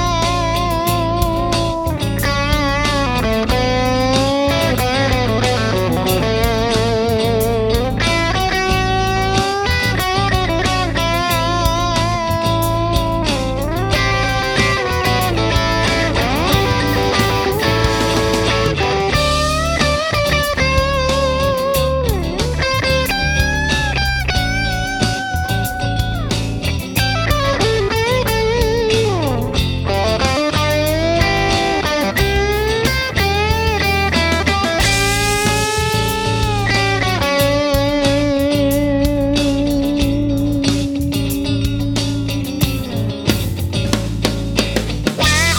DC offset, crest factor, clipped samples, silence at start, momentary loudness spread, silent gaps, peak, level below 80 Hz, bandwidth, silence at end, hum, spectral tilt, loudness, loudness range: under 0.1%; 16 dB; under 0.1%; 0 s; 4 LU; none; 0 dBFS; -26 dBFS; over 20 kHz; 0 s; none; -4.5 dB/octave; -16 LUFS; 3 LU